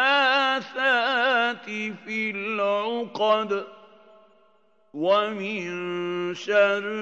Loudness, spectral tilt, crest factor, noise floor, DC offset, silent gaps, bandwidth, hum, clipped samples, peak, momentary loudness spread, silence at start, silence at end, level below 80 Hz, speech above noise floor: -24 LUFS; -4 dB/octave; 18 dB; -63 dBFS; under 0.1%; none; 8 kHz; none; under 0.1%; -8 dBFS; 10 LU; 0 s; 0 s; -88 dBFS; 38 dB